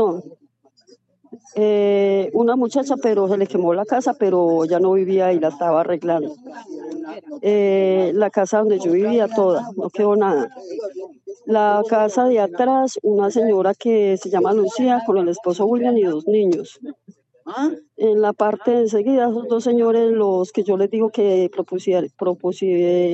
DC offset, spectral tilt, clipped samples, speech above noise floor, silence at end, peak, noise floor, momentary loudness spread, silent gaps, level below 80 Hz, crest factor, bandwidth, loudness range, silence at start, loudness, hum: under 0.1%; -6.5 dB/octave; under 0.1%; 37 dB; 0 s; -4 dBFS; -55 dBFS; 12 LU; none; -86 dBFS; 14 dB; 8.2 kHz; 2 LU; 0 s; -18 LUFS; none